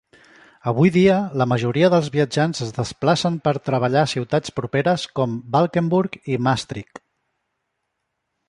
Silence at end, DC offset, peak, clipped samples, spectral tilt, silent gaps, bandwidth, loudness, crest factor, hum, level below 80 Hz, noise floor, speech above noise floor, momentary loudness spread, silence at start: 1.65 s; under 0.1%; -4 dBFS; under 0.1%; -6.5 dB/octave; none; 11 kHz; -20 LUFS; 18 dB; none; -54 dBFS; -76 dBFS; 57 dB; 8 LU; 0.65 s